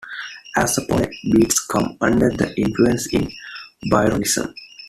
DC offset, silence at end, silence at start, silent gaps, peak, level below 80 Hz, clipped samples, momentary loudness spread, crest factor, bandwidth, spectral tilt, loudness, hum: under 0.1%; 0 s; 0 s; none; -2 dBFS; -42 dBFS; under 0.1%; 13 LU; 18 dB; 14.5 kHz; -4.5 dB/octave; -19 LUFS; none